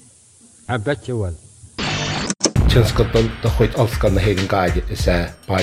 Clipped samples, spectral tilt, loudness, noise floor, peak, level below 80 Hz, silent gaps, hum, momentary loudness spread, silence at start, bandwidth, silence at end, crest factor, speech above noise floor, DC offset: under 0.1%; -5 dB/octave; -19 LUFS; -49 dBFS; 0 dBFS; -26 dBFS; none; none; 11 LU; 0.7 s; 15.5 kHz; 0 s; 18 dB; 31 dB; under 0.1%